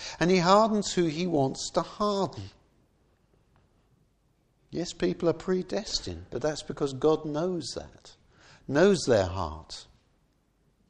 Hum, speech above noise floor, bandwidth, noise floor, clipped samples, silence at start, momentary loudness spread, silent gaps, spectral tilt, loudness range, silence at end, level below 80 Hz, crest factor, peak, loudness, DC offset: none; 42 dB; 10.5 kHz; -69 dBFS; under 0.1%; 0 s; 18 LU; none; -5 dB/octave; 8 LU; 1.05 s; -54 dBFS; 22 dB; -8 dBFS; -27 LUFS; under 0.1%